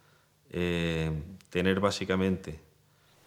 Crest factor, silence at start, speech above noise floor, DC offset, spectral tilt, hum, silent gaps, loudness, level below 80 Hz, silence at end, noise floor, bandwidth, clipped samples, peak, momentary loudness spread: 20 dB; 0.55 s; 35 dB; under 0.1%; -6 dB/octave; none; none; -30 LUFS; -50 dBFS; 0.7 s; -64 dBFS; 14.5 kHz; under 0.1%; -12 dBFS; 13 LU